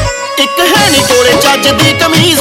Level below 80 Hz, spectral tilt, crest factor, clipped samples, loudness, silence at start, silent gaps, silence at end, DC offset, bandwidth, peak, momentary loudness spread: -30 dBFS; -3 dB/octave; 8 dB; 0.8%; -7 LUFS; 0 s; none; 0 s; under 0.1%; 18.5 kHz; 0 dBFS; 5 LU